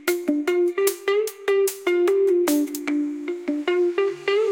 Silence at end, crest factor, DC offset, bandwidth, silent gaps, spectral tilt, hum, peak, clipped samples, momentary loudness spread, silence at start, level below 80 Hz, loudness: 0 s; 16 dB; under 0.1%; 17 kHz; none; -2.5 dB/octave; none; -6 dBFS; under 0.1%; 6 LU; 0 s; -74 dBFS; -22 LUFS